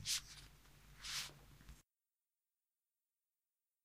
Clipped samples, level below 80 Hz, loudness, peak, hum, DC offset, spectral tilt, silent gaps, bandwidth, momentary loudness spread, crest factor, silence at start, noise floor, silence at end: under 0.1%; -68 dBFS; -46 LUFS; -28 dBFS; none; under 0.1%; 0.5 dB/octave; none; 15.5 kHz; 23 LU; 24 dB; 0 s; under -90 dBFS; 2.05 s